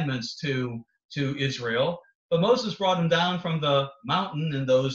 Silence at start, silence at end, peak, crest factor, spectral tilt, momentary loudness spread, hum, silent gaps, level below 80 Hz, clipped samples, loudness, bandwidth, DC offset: 0 s; 0 s; -10 dBFS; 16 dB; -6 dB/octave; 8 LU; none; 1.04-1.09 s, 2.15-2.29 s; -64 dBFS; under 0.1%; -26 LUFS; 7.6 kHz; under 0.1%